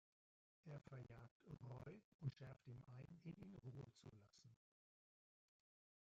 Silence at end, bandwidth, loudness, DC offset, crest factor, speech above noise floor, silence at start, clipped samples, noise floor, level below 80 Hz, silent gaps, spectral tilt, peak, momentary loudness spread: 1.45 s; 7.4 kHz; -59 LUFS; under 0.1%; 24 dB; over 31 dB; 0.65 s; under 0.1%; under -90 dBFS; -82 dBFS; 1.31-1.40 s, 2.04-2.19 s; -8 dB/octave; -38 dBFS; 11 LU